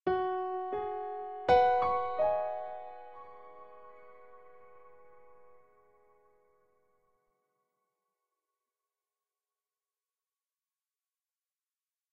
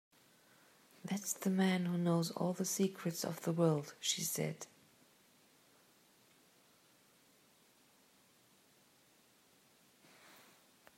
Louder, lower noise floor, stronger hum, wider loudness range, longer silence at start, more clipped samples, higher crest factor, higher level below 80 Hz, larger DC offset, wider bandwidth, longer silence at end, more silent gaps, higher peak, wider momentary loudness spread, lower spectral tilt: first, -31 LUFS vs -37 LUFS; first, under -90 dBFS vs -69 dBFS; neither; first, 23 LU vs 8 LU; second, 0.05 s vs 1.05 s; neither; about the same, 24 dB vs 22 dB; first, -66 dBFS vs -88 dBFS; neither; second, 7.2 kHz vs 16 kHz; first, 7.75 s vs 0.7 s; neither; first, -14 dBFS vs -20 dBFS; first, 27 LU vs 19 LU; first, -6.5 dB/octave vs -4.5 dB/octave